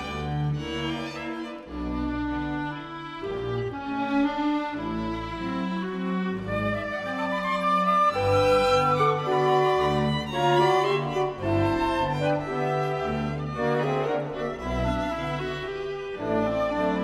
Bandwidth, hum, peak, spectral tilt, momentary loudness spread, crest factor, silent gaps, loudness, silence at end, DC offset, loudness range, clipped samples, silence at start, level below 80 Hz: 14 kHz; none; -10 dBFS; -6.5 dB/octave; 10 LU; 16 dB; none; -26 LUFS; 0 s; under 0.1%; 7 LU; under 0.1%; 0 s; -44 dBFS